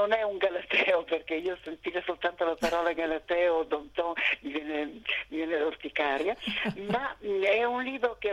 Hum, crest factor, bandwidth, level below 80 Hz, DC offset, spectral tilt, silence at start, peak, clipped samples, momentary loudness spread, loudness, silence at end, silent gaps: none; 18 dB; 14 kHz; -60 dBFS; under 0.1%; -4.5 dB/octave; 0 s; -12 dBFS; under 0.1%; 7 LU; -29 LUFS; 0 s; none